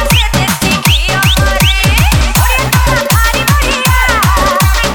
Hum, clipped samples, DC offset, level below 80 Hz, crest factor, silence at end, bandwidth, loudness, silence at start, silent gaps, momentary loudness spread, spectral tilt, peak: none; under 0.1%; 0.5%; -14 dBFS; 10 dB; 0 s; over 20 kHz; -9 LUFS; 0 s; none; 1 LU; -3.5 dB/octave; 0 dBFS